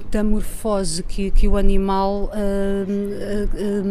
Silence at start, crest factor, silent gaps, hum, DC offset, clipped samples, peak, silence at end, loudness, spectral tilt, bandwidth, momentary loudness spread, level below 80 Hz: 0 s; 14 dB; none; none; under 0.1%; under 0.1%; -2 dBFS; 0 s; -22 LUFS; -6 dB/octave; 13.5 kHz; 5 LU; -20 dBFS